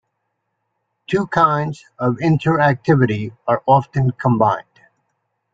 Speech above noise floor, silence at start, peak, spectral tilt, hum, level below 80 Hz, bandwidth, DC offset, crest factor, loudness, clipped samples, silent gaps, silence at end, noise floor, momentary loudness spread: 57 dB; 1.1 s; -2 dBFS; -8.5 dB/octave; none; -52 dBFS; 7.8 kHz; under 0.1%; 18 dB; -17 LUFS; under 0.1%; none; 0.9 s; -74 dBFS; 8 LU